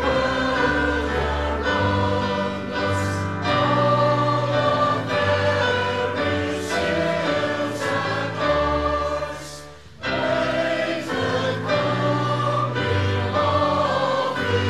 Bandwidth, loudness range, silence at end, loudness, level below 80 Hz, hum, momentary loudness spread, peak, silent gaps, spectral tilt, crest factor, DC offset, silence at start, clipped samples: 13.5 kHz; 3 LU; 0 s; -22 LUFS; -40 dBFS; none; 5 LU; -10 dBFS; none; -5.5 dB/octave; 12 dB; 0.4%; 0 s; under 0.1%